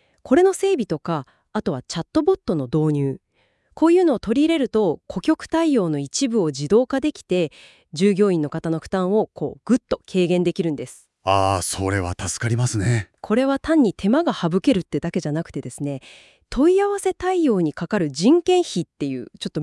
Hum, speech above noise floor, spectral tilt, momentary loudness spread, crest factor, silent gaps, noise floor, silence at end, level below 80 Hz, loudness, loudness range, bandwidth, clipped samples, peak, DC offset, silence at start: none; 43 dB; -6 dB/octave; 11 LU; 16 dB; none; -63 dBFS; 0 s; -50 dBFS; -21 LUFS; 2 LU; 12 kHz; under 0.1%; -4 dBFS; under 0.1%; 0.25 s